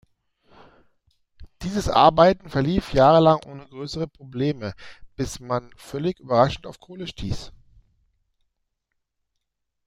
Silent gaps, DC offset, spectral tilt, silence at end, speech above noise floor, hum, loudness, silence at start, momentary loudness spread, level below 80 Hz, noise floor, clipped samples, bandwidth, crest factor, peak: none; under 0.1%; -6.5 dB/octave; 2.35 s; 57 dB; none; -21 LUFS; 1.4 s; 20 LU; -44 dBFS; -78 dBFS; under 0.1%; 15 kHz; 22 dB; -2 dBFS